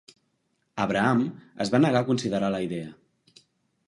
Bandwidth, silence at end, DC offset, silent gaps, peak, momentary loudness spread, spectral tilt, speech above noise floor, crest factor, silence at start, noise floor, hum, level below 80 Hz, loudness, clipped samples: 11.5 kHz; 0.95 s; under 0.1%; none; -8 dBFS; 13 LU; -6.5 dB/octave; 49 dB; 20 dB; 0.75 s; -74 dBFS; none; -62 dBFS; -25 LUFS; under 0.1%